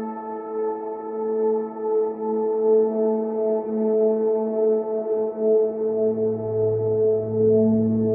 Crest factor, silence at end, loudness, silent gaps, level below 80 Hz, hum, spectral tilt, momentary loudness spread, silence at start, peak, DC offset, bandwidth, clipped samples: 12 dB; 0 s; -22 LUFS; none; -64 dBFS; none; -14.5 dB/octave; 8 LU; 0 s; -10 dBFS; under 0.1%; 2.3 kHz; under 0.1%